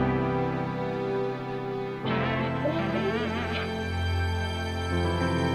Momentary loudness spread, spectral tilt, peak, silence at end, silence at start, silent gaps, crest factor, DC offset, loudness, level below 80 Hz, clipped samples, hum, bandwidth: 5 LU; -7 dB/octave; -14 dBFS; 0 s; 0 s; none; 14 dB; under 0.1%; -29 LUFS; -44 dBFS; under 0.1%; none; 13.5 kHz